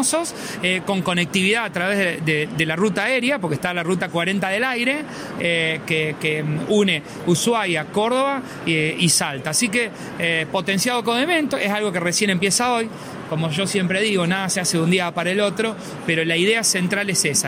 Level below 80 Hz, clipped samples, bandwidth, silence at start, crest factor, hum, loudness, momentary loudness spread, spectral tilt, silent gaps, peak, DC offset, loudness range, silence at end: -58 dBFS; under 0.1%; 16 kHz; 0 s; 16 dB; none; -20 LUFS; 6 LU; -3.5 dB/octave; none; -4 dBFS; under 0.1%; 1 LU; 0 s